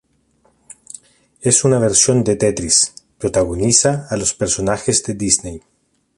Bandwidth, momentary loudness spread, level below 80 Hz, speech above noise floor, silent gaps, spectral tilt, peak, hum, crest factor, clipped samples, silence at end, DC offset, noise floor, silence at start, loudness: 11.5 kHz; 11 LU; -42 dBFS; 43 dB; none; -3.5 dB/octave; 0 dBFS; none; 18 dB; under 0.1%; 0.6 s; under 0.1%; -59 dBFS; 1.4 s; -15 LUFS